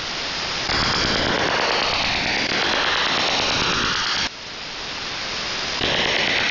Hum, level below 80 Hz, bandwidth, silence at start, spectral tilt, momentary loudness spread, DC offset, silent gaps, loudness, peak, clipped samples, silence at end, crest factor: none; -42 dBFS; 6 kHz; 0 s; -2 dB/octave; 7 LU; under 0.1%; none; -20 LUFS; -10 dBFS; under 0.1%; 0 s; 12 dB